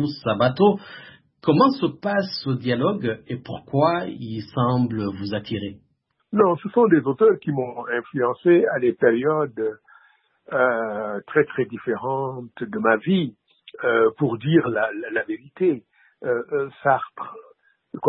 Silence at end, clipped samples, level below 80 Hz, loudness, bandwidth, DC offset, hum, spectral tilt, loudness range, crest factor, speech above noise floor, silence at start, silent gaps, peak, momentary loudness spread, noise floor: 0 s; under 0.1%; -62 dBFS; -22 LUFS; 5.8 kHz; under 0.1%; none; -11.5 dB/octave; 5 LU; 18 dB; 47 dB; 0 s; none; -4 dBFS; 13 LU; -69 dBFS